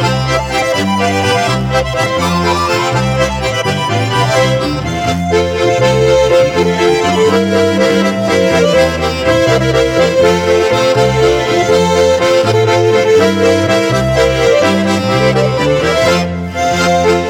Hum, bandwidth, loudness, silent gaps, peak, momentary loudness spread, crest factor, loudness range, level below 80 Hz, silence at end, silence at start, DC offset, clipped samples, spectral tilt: none; 17 kHz; -11 LUFS; none; 0 dBFS; 4 LU; 10 dB; 3 LU; -32 dBFS; 0 s; 0 s; under 0.1%; under 0.1%; -5 dB/octave